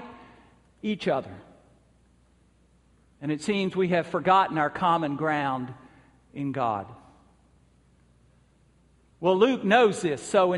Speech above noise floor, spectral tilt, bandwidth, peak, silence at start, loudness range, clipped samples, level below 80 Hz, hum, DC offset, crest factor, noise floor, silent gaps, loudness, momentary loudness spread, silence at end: 37 dB; -5.5 dB/octave; 11.5 kHz; -6 dBFS; 0 s; 10 LU; under 0.1%; -64 dBFS; none; under 0.1%; 22 dB; -62 dBFS; none; -25 LUFS; 15 LU; 0 s